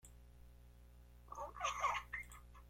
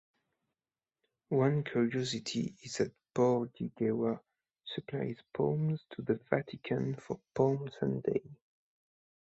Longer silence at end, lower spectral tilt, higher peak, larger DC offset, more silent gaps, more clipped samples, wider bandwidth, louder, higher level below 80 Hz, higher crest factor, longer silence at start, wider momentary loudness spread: second, 0 s vs 0.95 s; second, -1.5 dB/octave vs -6.5 dB/octave; second, -26 dBFS vs -12 dBFS; neither; neither; neither; first, 16.5 kHz vs 8.2 kHz; second, -44 LUFS vs -34 LUFS; first, -60 dBFS vs -70 dBFS; about the same, 22 dB vs 22 dB; second, 0.05 s vs 1.3 s; first, 24 LU vs 10 LU